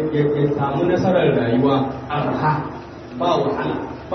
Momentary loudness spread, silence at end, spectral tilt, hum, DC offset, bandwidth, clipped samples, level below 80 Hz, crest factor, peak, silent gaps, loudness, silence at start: 9 LU; 0 s; -8 dB/octave; none; under 0.1%; 6.4 kHz; under 0.1%; -48 dBFS; 14 dB; -4 dBFS; none; -19 LUFS; 0 s